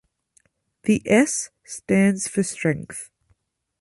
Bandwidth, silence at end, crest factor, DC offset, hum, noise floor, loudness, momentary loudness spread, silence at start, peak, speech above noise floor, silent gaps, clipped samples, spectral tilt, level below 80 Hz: 11.5 kHz; 0.75 s; 20 dB; under 0.1%; none; -67 dBFS; -21 LUFS; 17 LU; 0.85 s; -4 dBFS; 46 dB; none; under 0.1%; -5 dB/octave; -58 dBFS